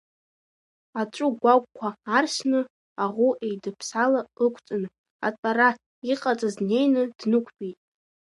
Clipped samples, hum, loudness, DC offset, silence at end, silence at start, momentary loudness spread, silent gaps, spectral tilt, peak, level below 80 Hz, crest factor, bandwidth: under 0.1%; none; -25 LUFS; under 0.1%; 0.55 s; 0.95 s; 12 LU; 2.70-2.96 s, 4.98-5.04 s, 5.10-5.19 s, 5.38-5.43 s, 5.86-6.02 s; -4.5 dB/octave; -6 dBFS; -78 dBFS; 20 dB; 11.5 kHz